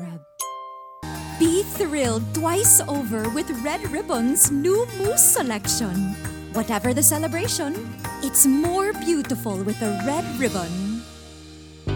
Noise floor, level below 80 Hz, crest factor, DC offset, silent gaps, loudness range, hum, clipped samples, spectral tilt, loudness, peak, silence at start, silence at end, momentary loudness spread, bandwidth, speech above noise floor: -42 dBFS; -46 dBFS; 22 dB; under 0.1%; none; 3 LU; none; under 0.1%; -3.5 dB/octave; -20 LUFS; 0 dBFS; 0 s; 0 s; 17 LU; 19 kHz; 21 dB